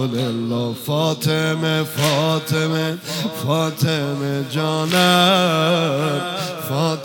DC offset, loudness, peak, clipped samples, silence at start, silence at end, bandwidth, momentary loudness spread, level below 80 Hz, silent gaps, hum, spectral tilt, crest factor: under 0.1%; -19 LUFS; 0 dBFS; under 0.1%; 0 s; 0 s; 18 kHz; 9 LU; -62 dBFS; none; none; -5 dB/octave; 18 dB